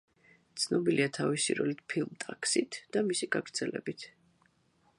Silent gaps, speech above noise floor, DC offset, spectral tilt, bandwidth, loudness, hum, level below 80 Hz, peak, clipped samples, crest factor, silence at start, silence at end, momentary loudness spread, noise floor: none; 38 dB; under 0.1%; -3.5 dB/octave; 11.5 kHz; -32 LUFS; none; -76 dBFS; -14 dBFS; under 0.1%; 20 dB; 0.55 s; 0.9 s; 11 LU; -70 dBFS